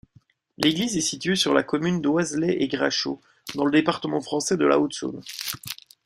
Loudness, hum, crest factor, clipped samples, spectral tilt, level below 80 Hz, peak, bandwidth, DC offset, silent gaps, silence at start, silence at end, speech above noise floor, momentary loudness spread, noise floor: -24 LUFS; none; 20 dB; under 0.1%; -4 dB/octave; -62 dBFS; -4 dBFS; 16 kHz; under 0.1%; none; 0.6 s; 0.3 s; 35 dB; 11 LU; -59 dBFS